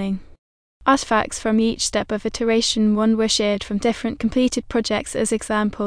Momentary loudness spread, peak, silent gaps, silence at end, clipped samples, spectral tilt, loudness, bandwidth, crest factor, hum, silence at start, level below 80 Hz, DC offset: 6 LU; -4 dBFS; 0.38-0.80 s; 0 s; under 0.1%; -4 dB/octave; -20 LUFS; 10.5 kHz; 16 dB; none; 0 s; -44 dBFS; under 0.1%